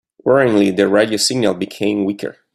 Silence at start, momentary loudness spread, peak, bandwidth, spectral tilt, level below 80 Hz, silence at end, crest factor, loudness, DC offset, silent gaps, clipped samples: 0.25 s; 7 LU; 0 dBFS; 13.5 kHz; -4.5 dB/octave; -56 dBFS; 0.25 s; 16 dB; -15 LUFS; under 0.1%; none; under 0.1%